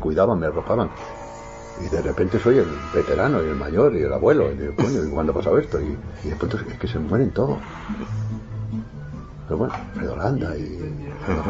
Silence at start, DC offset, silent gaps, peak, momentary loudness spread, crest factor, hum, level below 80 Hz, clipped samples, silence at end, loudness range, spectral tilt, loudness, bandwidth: 0 s; under 0.1%; none; -4 dBFS; 14 LU; 18 dB; none; -38 dBFS; under 0.1%; 0 s; 8 LU; -8 dB/octave; -23 LUFS; 7.8 kHz